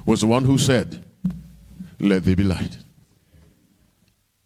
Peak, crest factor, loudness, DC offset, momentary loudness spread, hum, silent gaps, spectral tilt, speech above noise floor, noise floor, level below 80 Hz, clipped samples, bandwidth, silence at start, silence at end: -2 dBFS; 20 dB; -21 LUFS; under 0.1%; 19 LU; none; none; -6 dB/octave; 45 dB; -64 dBFS; -44 dBFS; under 0.1%; 15.5 kHz; 0.05 s; 1.7 s